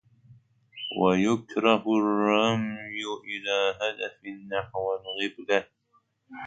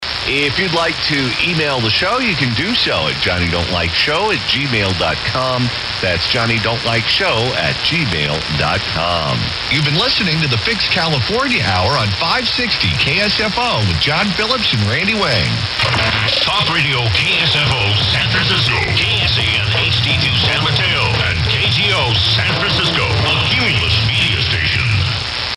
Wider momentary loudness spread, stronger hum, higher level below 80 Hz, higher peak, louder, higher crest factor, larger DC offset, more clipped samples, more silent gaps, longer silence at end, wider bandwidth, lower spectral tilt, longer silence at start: first, 12 LU vs 3 LU; neither; second, -64 dBFS vs -34 dBFS; about the same, -6 dBFS vs -4 dBFS; second, -27 LUFS vs -14 LUFS; first, 22 dB vs 12 dB; neither; neither; neither; about the same, 0 s vs 0 s; second, 9.2 kHz vs 12 kHz; about the same, -5 dB/octave vs -4.5 dB/octave; first, 0.3 s vs 0 s